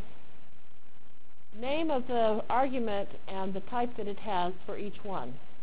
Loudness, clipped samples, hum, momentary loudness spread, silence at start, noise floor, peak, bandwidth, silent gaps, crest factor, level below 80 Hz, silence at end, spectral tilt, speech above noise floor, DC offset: -33 LUFS; under 0.1%; none; 11 LU; 0 s; -63 dBFS; -16 dBFS; 4 kHz; none; 18 dB; -60 dBFS; 0.1 s; -9 dB/octave; 30 dB; 4%